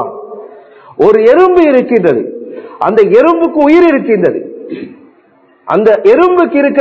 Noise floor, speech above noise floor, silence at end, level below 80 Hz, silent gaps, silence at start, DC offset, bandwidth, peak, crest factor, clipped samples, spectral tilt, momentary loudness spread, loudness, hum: -47 dBFS; 40 dB; 0 s; -50 dBFS; none; 0 s; under 0.1%; 7.2 kHz; 0 dBFS; 10 dB; 2%; -8 dB/octave; 19 LU; -8 LUFS; none